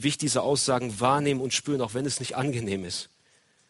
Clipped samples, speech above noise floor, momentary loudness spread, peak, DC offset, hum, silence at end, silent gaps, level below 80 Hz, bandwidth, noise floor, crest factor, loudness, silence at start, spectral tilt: under 0.1%; 37 dB; 7 LU; -8 dBFS; under 0.1%; none; 0.65 s; none; -62 dBFS; 11.5 kHz; -64 dBFS; 20 dB; -27 LUFS; 0 s; -4 dB/octave